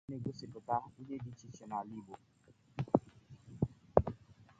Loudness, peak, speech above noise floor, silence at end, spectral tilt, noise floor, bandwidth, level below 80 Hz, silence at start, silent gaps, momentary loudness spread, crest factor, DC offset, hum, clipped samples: -39 LUFS; -8 dBFS; 16 dB; 0.15 s; -8.5 dB/octave; -59 dBFS; 8.6 kHz; -56 dBFS; 0.1 s; none; 22 LU; 32 dB; under 0.1%; none; under 0.1%